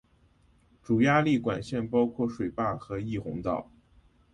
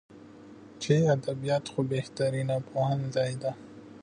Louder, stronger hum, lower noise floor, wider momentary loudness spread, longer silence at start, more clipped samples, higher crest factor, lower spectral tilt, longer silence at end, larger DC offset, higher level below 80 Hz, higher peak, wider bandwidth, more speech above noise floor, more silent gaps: about the same, -28 LUFS vs -29 LUFS; neither; first, -63 dBFS vs -49 dBFS; second, 11 LU vs 22 LU; first, 0.9 s vs 0.1 s; neither; about the same, 18 dB vs 18 dB; about the same, -7.5 dB/octave vs -6.5 dB/octave; first, 0.7 s vs 0 s; neither; first, -56 dBFS vs -66 dBFS; about the same, -12 dBFS vs -12 dBFS; about the same, 10 kHz vs 10 kHz; first, 36 dB vs 21 dB; neither